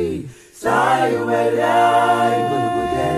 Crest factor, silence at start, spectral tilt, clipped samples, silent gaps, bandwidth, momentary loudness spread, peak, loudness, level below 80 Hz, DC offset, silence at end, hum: 12 dB; 0 s; -5.5 dB/octave; under 0.1%; none; 14 kHz; 11 LU; -4 dBFS; -17 LUFS; -48 dBFS; under 0.1%; 0 s; none